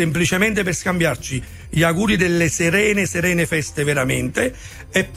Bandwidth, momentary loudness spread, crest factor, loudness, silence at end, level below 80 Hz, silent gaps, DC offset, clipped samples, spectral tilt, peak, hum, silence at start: 15.5 kHz; 8 LU; 16 dB; -19 LUFS; 0 s; -40 dBFS; none; under 0.1%; under 0.1%; -4.5 dB/octave; -4 dBFS; none; 0 s